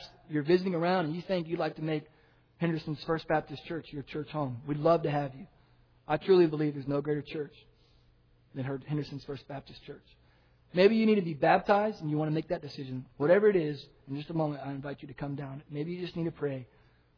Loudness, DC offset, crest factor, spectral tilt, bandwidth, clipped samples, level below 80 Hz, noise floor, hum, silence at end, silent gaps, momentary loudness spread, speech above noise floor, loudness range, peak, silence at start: -31 LUFS; under 0.1%; 20 dB; -8.5 dB/octave; 5.4 kHz; under 0.1%; -62 dBFS; -64 dBFS; none; 0.55 s; none; 17 LU; 34 dB; 8 LU; -10 dBFS; 0 s